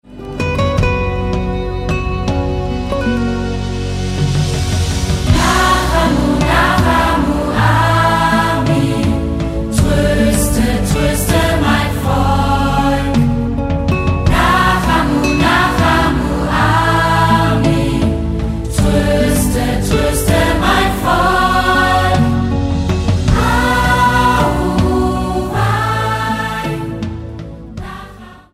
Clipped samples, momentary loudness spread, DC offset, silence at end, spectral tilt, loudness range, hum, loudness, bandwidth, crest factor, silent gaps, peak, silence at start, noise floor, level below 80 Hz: under 0.1%; 7 LU; under 0.1%; 0.15 s; -5.5 dB/octave; 5 LU; none; -14 LUFS; 16 kHz; 14 dB; none; 0 dBFS; 0.1 s; -35 dBFS; -22 dBFS